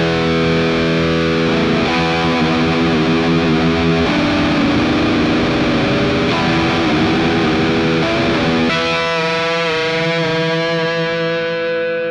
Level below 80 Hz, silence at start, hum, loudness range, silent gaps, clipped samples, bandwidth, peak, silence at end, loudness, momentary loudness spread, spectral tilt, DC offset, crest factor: -36 dBFS; 0 s; none; 1 LU; none; under 0.1%; 10.5 kHz; -4 dBFS; 0 s; -15 LUFS; 2 LU; -6 dB/octave; under 0.1%; 12 dB